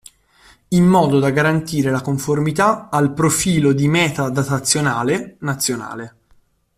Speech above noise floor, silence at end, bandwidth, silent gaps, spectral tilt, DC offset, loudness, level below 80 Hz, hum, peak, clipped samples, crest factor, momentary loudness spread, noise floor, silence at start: 39 dB; 0.7 s; 15.5 kHz; none; -5 dB/octave; under 0.1%; -17 LUFS; -48 dBFS; none; -2 dBFS; under 0.1%; 16 dB; 7 LU; -55 dBFS; 0.7 s